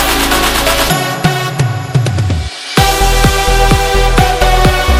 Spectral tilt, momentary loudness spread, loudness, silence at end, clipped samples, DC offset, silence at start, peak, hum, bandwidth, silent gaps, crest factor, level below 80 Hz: -4 dB/octave; 5 LU; -11 LUFS; 0 s; 0.4%; under 0.1%; 0 s; 0 dBFS; none; 16.5 kHz; none; 10 dB; -16 dBFS